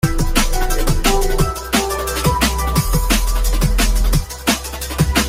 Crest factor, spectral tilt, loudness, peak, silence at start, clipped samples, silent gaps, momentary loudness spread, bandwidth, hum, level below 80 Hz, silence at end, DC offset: 14 dB; -4 dB/octave; -18 LUFS; -2 dBFS; 0.05 s; under 0.1%; none; 3 LU; 16.5 kHz; none; -18 dBFS; 0 s; under 0.1%